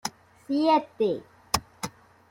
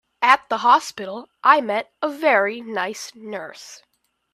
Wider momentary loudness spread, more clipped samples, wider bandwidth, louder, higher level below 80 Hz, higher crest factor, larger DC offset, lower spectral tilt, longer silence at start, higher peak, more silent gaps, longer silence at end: about the same, 16 LU vs 16 LU; neither; first, 16.5 kHz vs 14.5 kHz; second, -27 LUFS vs -19 LUFS; first, -56 dBFS vs -72 dBFS; about the same, 22 dB vs 22 dB; neither; first, -4 dB/octave vs -2.5 dB/octave; second, 0.05 s vs 0.2 s; second, -6 dBFS vs 0 dBFS; neither; second, 0.4 s vs 0.6 s